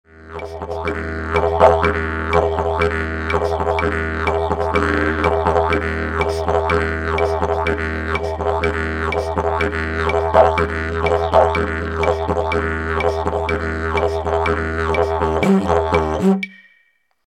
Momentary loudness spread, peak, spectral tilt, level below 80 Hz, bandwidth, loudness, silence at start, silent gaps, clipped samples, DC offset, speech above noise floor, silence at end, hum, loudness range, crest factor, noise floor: 7 LU; 0 dBFS; -6.5 dB/octave; -30 dBFS; 11 kHz; -18 LUFS; 0.15 s; none; under 0.1%; under 0.1%; 43 dB; 0.7 s; none; 2 LU; 18 dB; -61 dBFS